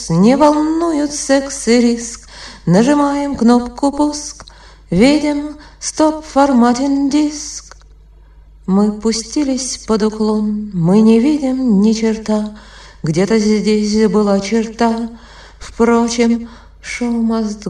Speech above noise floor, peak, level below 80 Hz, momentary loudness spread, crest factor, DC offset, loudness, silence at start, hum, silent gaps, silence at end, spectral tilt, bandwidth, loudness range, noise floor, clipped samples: 28 dB; 0 dBFS; -40 dBFS; 14 LU; 14 dB; under 0.1%; -14 LUFS; 0 s; none; none; 0 s; -5.5 dB/octave; 11 kHz; 3 LU; -42 dBFS; under 0.1%